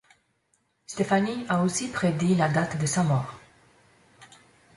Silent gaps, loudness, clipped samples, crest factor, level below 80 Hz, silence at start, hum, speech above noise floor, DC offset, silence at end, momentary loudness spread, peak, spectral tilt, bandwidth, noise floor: none; -25 LUFS; under 0.1%; 18 dB; -60 dBFS; 0.9 s; none; 46 dB; under 0.1%; 0.5 s; 6 LU; -10 dBFS; -5.5 dB/octave; 11.5 kHz; -71 dBFS